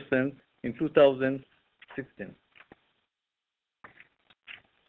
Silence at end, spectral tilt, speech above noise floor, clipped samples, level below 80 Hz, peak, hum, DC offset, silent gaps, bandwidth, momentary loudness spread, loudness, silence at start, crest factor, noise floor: 0.35 s; -9 dB/octave; 61 dB; under 0.1%; -66 dBFS; -8 dBFS; none; under 0.1%; none; 4.2 kHz; 25 LU; -27 LUFS; 0 s; 24 dB; -88 dBFS